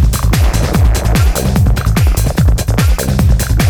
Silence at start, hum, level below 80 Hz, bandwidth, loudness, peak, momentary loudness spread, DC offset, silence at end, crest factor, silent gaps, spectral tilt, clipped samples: 0 s; none; -12 dBFS; over 20 kHz; -12 LUFS; 0 dBFS; 1 LU; under 0.1%; 0 s; 10 dB; none; -5.5 dB/octave; under 0.1%